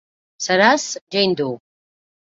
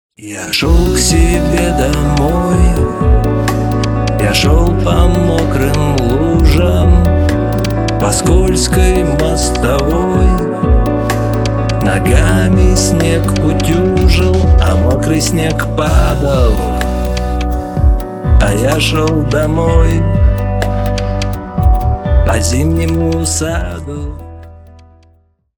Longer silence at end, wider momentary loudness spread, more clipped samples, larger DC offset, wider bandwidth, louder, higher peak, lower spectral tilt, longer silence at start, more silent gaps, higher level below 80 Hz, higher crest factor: second, 0.7 s vs 1 s; first, 13 LU vs 6 LU; neither; neither; second, 7.8 kHz vs 19.5 kHz; second, -18 LUFS vs -12 LUFS; about the same, -2 dBFS vs 0 dBFS; second, -3 dB/octave vs -5.5 dB/octave; first, 0.4 s vs 0.2 s; first, 1.01-1.07 s vs none; second, -64 dBFS vs -16 dBFS; first, 18 dB vs 10 dB